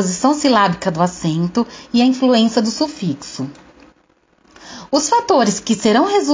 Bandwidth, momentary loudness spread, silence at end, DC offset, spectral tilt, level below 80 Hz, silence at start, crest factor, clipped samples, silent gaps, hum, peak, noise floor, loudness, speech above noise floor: 7.8 kHz; 12 LU; 0 s; under 0.1%; -4.5 dB/octave; -54 dBFS; 0 s; 14 dB; under 0.1%; none; none; -2 dBFS; -57 dBFS; -16 LUFS; 41 dB